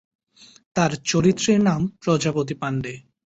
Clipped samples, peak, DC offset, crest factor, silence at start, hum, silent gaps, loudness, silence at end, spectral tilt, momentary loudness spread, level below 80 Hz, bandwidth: under 0.1%; -6 dBFS; under 0.1%; 16 dB; 0.75 s; none; none; -22 LUFS; 0.25 s; -5.5 dB/octave; 9 LU; -54 dBFS; 8.2 kHz